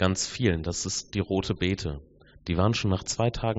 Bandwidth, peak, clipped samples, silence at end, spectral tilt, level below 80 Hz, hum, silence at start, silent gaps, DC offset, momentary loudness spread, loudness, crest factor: 8 kHz; -8 dBFS; under 0.1%; 0 s; -5 dB/octave; -44 dBFS; none; 0 s; none; under 0.1%; 7 LU; -28 LUFS; 20 dB